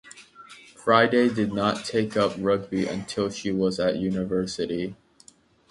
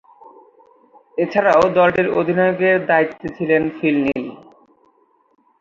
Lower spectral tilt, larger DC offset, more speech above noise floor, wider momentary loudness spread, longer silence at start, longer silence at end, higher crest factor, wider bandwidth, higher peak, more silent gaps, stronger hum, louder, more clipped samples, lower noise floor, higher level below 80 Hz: second, -5.5 dB/octave vs -7 dB/octave; neither; second, 32 dB vs 42 dB; about the same, 10 LU vs 11 LU; second, 0.05 s vs 0.25 s; second, 0.75 s vs 1.25 s; about the same, 22 dB vs 18 dB; first, 11.5 kHz vs 7.6 kHz; about the same, -4 dBFS vs -2 dBFS; neither; neither; second, -25 LUFS vs -17 LUFS; neither; about the same, -56 dBFS vs -58 dBFS; about the same, -56 dBFS vs -56 dBFS